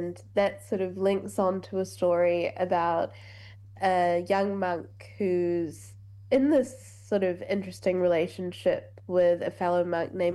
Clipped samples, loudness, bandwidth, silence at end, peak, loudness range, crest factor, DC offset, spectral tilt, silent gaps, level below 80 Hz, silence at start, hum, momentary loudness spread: under 0.1%; -28 LUFS; 12.5 kHz; 0 s; -12 dBFS; 1 LU; 16 dB; under 0.1%; -6.5 dB/octave; none; -66 dBFS; 0 s; none; 10 LU